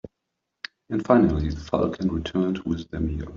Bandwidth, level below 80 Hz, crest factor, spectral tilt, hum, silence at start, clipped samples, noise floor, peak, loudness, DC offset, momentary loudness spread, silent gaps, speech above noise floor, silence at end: 7.4 kHz; -40 dBFS; 22 dB; -7 dB/octave; none; 0.05 s; under 0.1%; -81 dBFS; -4 dBFS; -24 LUFS; under 0.1%; 15 LU; none; 58 dB; 0 s